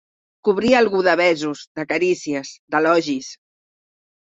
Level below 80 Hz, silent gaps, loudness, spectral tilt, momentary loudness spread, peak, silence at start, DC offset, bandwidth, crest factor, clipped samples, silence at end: -60 dBFS; 1.67-1.75 s, 2.59-2.68 s; -19 LUFS; -4.5 dB/octave; 12 LU; -2 dBFS; 0.45 s; under 0.1%; 8 kHz; 18 dB; under 0.1%; 0.9 s